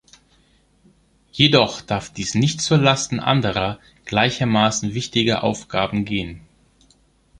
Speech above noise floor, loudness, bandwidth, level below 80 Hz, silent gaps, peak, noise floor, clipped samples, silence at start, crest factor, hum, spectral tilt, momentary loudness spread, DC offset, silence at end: 39 dB; -19 LUFS; 11 kHz; -48 dBFS; none; -2 dBFS; -58 dBFS; under 0.1%; 1.35 s; 20 dB; none; -4.5 dB/octave; 11 LU; under 0.1%; 1 s